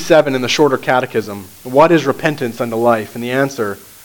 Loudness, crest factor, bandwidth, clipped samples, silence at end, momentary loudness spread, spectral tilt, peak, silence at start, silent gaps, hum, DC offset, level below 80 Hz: -15 LUFS; 14 dB; 19.5 kHz; under 0.1%; 0 s; 11 LU; -5 dB/octave; 0 dBFS; 0 s; none; none; under 0.1%; -54 dBFS